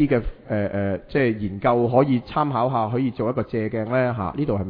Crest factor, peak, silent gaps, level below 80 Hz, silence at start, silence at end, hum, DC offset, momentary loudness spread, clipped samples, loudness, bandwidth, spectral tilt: 18 dB; -4 dBFS; none; -42 dBFS; 0 s; 0 s; none; under 0.1%; 7 LU; under 0.1%; -23 LUFS; 5.2 kHz; -11 dB/octave